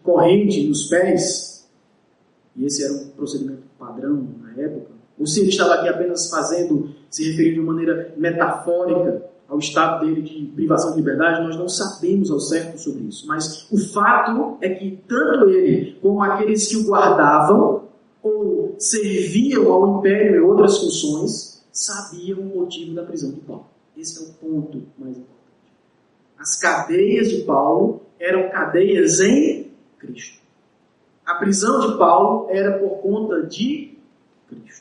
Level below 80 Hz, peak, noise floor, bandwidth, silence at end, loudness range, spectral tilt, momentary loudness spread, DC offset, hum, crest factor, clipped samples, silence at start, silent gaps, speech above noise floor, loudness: -66 dBFS; -2 dBFS; -59 dBFS; 11 kHz; 0.2 s; 11 LU; -4.5 dB/octave; 16 LU; under 0.1%; none; 18 dB; under 0.1%; 0.05 s; none; 41 dB; -18 LUFS